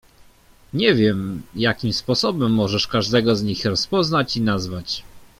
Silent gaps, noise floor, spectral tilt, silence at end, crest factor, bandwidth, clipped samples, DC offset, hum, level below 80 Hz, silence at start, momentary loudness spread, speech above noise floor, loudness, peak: none; -51 dBFS; -5.5 dB/octave; 0.15 s; 18 dB; 15.5 kHz; under 0.1%; under 0.1%; none; -48 dBFS; 0.75 s; 9 LU; 31 dB; -20 LUFS; -2 dBFS